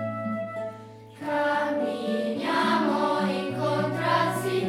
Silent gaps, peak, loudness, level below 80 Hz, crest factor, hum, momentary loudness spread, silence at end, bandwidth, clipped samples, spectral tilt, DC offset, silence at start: none; -10 dBFS; -26 LUFS; -72 dBFS; 16 dB; none; 12 LU; 0 s; 16 kHz; under 0.1%; -5.5 dB/octave; under 0.1%; 0 s